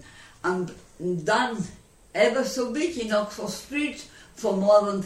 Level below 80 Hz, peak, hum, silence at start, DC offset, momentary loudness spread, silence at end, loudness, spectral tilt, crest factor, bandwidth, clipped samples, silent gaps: -58 dBFS; -8 dBFS; none; 0 s; under 0.1%; 14 LU; 0 s; -26 LUFS; -4.5 dB/octave; 18 dB; 15.5 kHz; under 0.1%; none